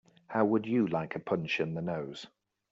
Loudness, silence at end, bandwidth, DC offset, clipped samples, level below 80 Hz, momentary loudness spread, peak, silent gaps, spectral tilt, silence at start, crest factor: -32 LUFS; 0.45 s; 7.8 kHz; under 0.1%; under 0.1%; -72 dBFS; 13 LU; -14 dBFS; none; -5.5 dB/octave; 0.3 s; 18 dB